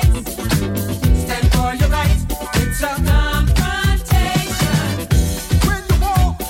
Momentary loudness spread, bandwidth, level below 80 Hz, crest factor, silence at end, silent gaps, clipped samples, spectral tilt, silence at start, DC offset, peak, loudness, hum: 3 LU; 17 kHz; -18 dBFS; 14 dB; 0 s; none; under 0.1%; -5 dB/octave; 0 s; under 0.1%; -2 dBFS; -17 LUFS; none